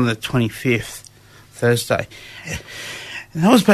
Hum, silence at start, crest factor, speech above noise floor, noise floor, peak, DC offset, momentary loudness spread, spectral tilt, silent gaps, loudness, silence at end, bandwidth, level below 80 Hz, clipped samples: none; 0 s; 18 dB; 27 dB; -45 dBFS; -2 dBFS; under 0.1%; 17 LU; -5.5 dB/octave; none; -21 LUFS; 0 s; 13.5 kHz; -48 dBFS; under 0.1%